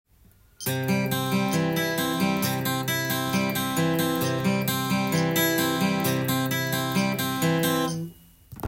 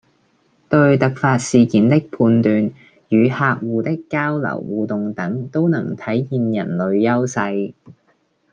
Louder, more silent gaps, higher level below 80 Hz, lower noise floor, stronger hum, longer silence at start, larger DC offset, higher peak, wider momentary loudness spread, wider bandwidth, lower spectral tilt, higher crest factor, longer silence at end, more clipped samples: second, -25 LUFS vs -18 LUFS; neither; about the same, -58 dBFS vs -58 dBFS; second, -57 dBFS vs -61 dBFS; neither; about the same, 0.6 s vs 0.7 s; neither; second, -10 dBFS vs -2 dBFS; second, 3 LU vs 8 LU; first, 17 kHz vs 9.6 kHz; second, -4.5 dB/octave vs -7 dB/octave; about the same, 14 dB vs 16 dB; second, 0 s vs 0.6 s; neither